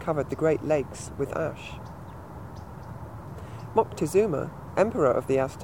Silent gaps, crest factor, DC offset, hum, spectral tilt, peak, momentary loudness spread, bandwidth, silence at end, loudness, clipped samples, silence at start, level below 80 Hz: none; 20 dB; 0.2%; none; -6.5 dB/octave; -8 dBFS; 18 LU; 16 kHz; 0 s; -27 LUFS; under 0.1%; 0 s; -52 dBFS